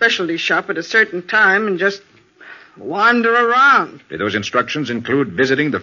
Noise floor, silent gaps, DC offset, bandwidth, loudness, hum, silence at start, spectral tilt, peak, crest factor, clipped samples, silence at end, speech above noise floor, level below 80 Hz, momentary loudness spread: -41 dBFS; none; under 0.1%; 7.2 kHz; -15 LUFS; none; 0 s; -2 dB/octave; -2 dBFS; 16 dB; under 0.1%; 0 s; 25 dB; -60 dBFS; 10 LU